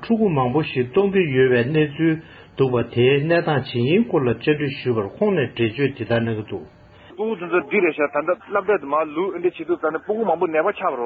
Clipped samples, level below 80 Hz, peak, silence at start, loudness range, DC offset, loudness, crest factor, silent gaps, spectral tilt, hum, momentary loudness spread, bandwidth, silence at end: under 0.1%; -54 dBFS; -4 dBFS; 0 s; 4 LU; under 0.1%; -20 LUFS; 16 dB; none; -10 dB/octave; none; 6 LU; 5 kHz; 0 s